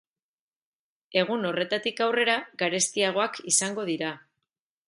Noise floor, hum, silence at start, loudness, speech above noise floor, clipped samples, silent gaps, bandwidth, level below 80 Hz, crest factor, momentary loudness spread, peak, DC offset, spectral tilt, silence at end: -84 dBFS; none; 1.1 s; -26 LUFS; 58 dB; under 0.1%; none; 11.5 kHz; -78 dBFS; 20 dB; 7 LU; -8 dBFS; under 0.1%; -2 dB/octave; 0.7 s